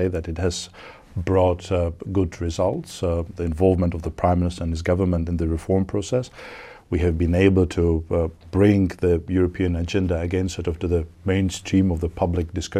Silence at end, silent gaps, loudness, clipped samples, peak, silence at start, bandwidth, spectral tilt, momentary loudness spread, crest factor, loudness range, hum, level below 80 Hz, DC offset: 0 s; none; -22 LUFS; under 0.1%; -4 dBFS; 0 s; 11 kHz; -7 dB/octave; 8 LU; 18 dB; 3 LU; none; -36 dBFS; under 0.1%